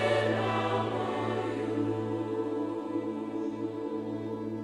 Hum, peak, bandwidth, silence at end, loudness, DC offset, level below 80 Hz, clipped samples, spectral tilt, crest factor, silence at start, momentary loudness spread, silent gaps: none; -16 dBFS; 11 kHz; 0 s; -32 LUFS; under 0.1%; -66 dBFS; under 0.1%; -7 dB/octave; 16 dB; 0 s; 7 LU; none